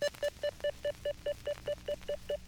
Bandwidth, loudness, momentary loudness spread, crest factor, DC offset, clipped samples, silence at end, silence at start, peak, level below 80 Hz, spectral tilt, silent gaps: over 20 kHz; -38 LUFS; 3 LU; 16 dB; under 0.1%; under 0.1%; 0 s; 0 s; -20 dBFS; -56 dBFS; -3.5 dB/octave; none